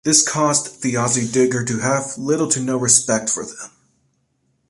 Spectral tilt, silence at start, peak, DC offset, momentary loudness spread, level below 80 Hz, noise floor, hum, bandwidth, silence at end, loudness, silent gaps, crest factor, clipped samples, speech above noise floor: -3 dB/octave; 0.05 s; 0 dBFS; under 0.1%; 9 LU; -58 dBFS; -66 dBFS; none; 11.5 kHz; 1 s; -17 LUFS; none; 20 dB; under 0.1%; 48 dB